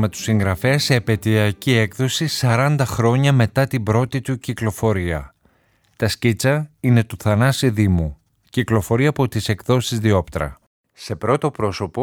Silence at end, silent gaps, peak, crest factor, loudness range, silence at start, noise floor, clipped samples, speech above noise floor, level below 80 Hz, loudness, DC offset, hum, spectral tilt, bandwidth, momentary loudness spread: 0 s; 10.67-10.84 s; -2 dBFS; 18 dB; 3 LU; 0 s; -60 dBFS; under 0.1%; 42 dB; -42 dBFS; -19 LUFS; under 0.1%; none; -6 dB/octave; 18 kHz; 8 LU